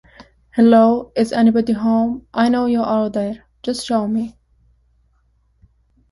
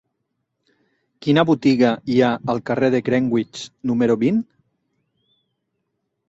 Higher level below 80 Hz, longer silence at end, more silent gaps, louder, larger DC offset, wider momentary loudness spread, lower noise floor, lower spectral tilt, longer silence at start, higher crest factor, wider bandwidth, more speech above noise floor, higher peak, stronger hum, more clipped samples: first, -52 dBFS vs -60 dBFS; about the same, 1.8 s vs 1.85 s; neither; about the same, -17 LUFS vs -19 LUFS; neither; first, 13 LU vs 10 LU; second, -60 dBFS vs -75 dBFS; about the same, -6.5 dB/octave vs -7 dB/octave; second, 0.2 s vs 1.2 s; about the same, 16 dB vs 18 dB; first, 11.5 kHz vs 8 kHz; second, 44 dB vs 57 dB; about the same, -2 dBFS vs -2 dBFS; neither; neither